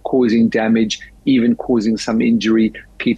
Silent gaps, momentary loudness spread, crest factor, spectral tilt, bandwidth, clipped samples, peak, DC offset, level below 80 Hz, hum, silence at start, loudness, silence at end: none; 6 LU; 10 dB; -5.5 dB/octave; 9.2 kHz; under 0.1%; -6 dBFS; under 0.1%; -46 dBFS; none; 0.05 s; -16 LUFS; 0 s